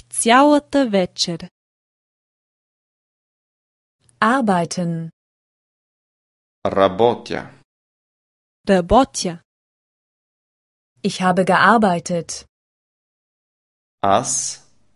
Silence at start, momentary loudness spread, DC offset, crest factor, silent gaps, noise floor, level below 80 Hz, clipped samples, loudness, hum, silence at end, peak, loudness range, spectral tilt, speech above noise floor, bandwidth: 0.15 s; 16 LU; under 0.1%; 20 dB; 1.51-3.99 s, 5.13-6.62 s, 7.64-8.64 s, 9.45-10.96 s, 12.49-13.98 s; under -90 dBFS; -46 dBFS; under 0.1%; -17 LUFS; none; 0.4 s; 0 dBFS; 5 LU; -4 dB/octave; over 73 dB; 11.5 kHz